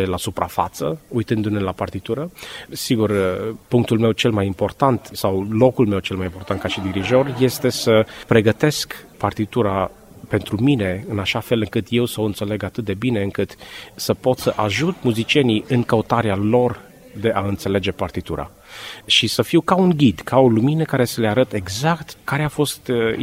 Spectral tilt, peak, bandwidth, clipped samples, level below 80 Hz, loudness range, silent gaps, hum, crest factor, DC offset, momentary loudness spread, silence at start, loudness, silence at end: -5.5 dB/octave; 0 dBFS; 16 kHz; under 0.1%; -48 dBFS; 4 LU; none; none; 18 dB; under 0.1%; 10 LU; 0 s; -20 LUFS; 0 s